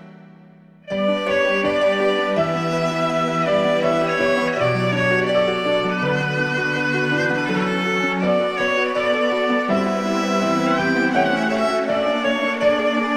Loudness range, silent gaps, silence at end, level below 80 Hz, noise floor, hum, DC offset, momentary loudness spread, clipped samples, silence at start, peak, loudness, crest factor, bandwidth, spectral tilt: 1 LU; none; 0 s; -56 dBFS; -47 dBFS; none; under 0.1%; 2 LU; under 0.1%; 0 s; -4 dBFS; -19 LUFS; 14 dB; 13 kHz; -5.5 dB/octave